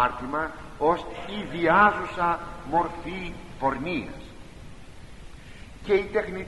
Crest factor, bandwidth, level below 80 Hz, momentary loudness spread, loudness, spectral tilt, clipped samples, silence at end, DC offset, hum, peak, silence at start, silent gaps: 22 dB; 11.5 kHz; -46 dBFS; 25 LU; -26 LUFS; -6 dB/octave; under 0.1%; 0 s; 0.4%; none; -6 dBFS; 0 s; none